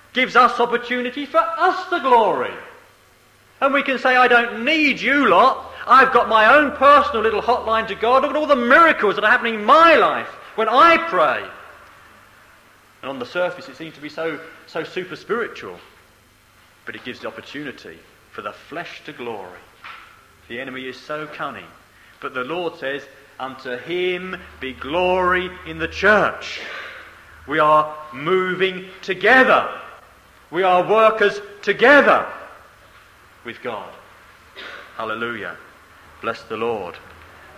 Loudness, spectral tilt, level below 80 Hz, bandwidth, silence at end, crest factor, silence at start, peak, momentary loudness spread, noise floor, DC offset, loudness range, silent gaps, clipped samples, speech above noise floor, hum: -17 LUFS; -4.5 dB/octave; -54 dBFS; 15.5 kHz; 0.6 s; 18 dB; 0.15 s; 0 dBFS; 21 LU; -53 dBFS; under 0.1%; 18 LU; none; under 0.1%; 35 dB; none